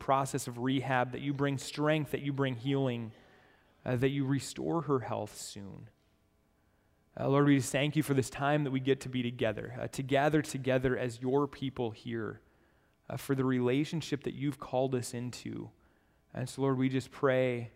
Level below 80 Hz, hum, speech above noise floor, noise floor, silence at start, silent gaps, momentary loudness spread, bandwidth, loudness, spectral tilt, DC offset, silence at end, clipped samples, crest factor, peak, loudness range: -64 dBFS; none; 39 dB; -71 dBFS; 0 s; none; 13 LU; 16 kHz; -33 LUFS; -6 dB/octave; under 0.1%; 0.05 s; under 0.1%; 20 dB; -14 dBFS; 5 LU